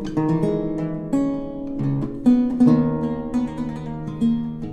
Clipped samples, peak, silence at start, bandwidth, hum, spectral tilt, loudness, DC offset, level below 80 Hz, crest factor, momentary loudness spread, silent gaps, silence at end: under 0.1%; -4 dBFS; 0 s; 9 kHz; none; -9 dB/octave; -22 LUFS; under 0.1%; -42 dBFS; 16 dB; 12 LU; none; 0 s